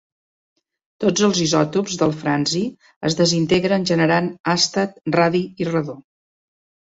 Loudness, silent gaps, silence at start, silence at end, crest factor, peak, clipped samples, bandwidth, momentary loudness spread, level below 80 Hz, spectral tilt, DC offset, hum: -19 LUFS; 2.96-3.01 s, 4.40-4.44 s; 1 s; 0.85 s; 16 dB; -4 dBFS; under 0.1%; 8 kHz; 7 LU; -56 dBFS; -4.5 dB/octave; under 0.1%; none